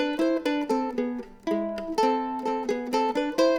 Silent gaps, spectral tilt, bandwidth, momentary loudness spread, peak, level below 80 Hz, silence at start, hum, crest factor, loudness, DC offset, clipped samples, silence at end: none; -4.5 dB/octave; 19 kHz; 5 LU; -10 dBFS; -58 dBFS; 0 s; none; 16 dB; -27 LUFS; under 0.1%; under 0.1%; 0 s